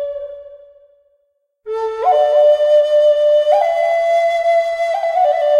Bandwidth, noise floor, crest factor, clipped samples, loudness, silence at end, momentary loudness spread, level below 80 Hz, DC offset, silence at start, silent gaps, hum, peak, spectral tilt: 9.8 kHz; -65 dBFS; 12 dB; under 0.1%; -14 LUFS; 0 s; 11 LU; -58 dBFS; under 0.1%; 0 s; none; none; -2 dBFS; -0.5 dB/octave